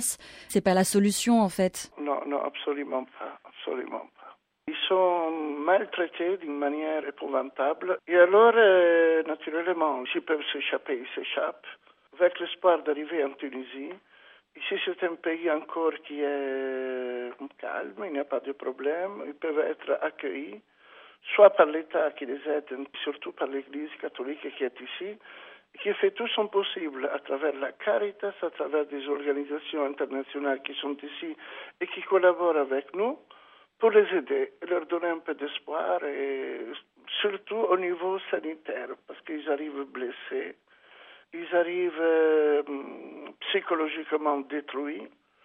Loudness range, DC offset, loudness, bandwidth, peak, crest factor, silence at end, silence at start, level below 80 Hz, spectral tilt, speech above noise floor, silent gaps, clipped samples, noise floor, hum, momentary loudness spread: 9 LU; under 0.1%; -28 LUFS; 9 kHz; -4 dBFS; 24 dB; 0.35 s; 0 s; -74 dBFS; -4 dB/octave; 26 dB; none; under 0.1%; -54 dBFS; none; 16 LU